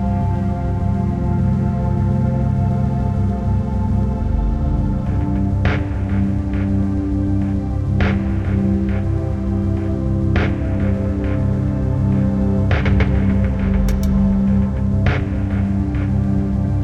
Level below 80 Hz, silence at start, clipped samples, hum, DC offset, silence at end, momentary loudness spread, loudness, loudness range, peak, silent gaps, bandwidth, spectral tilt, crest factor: -24 dBFS; 0 s; under 0.1%; none; under 0.1%; 0 s; 4 LU; -19 LUFS; 2 LU; -2 dBFS; none; 7 kHz; -9 dB/octave; 14 dB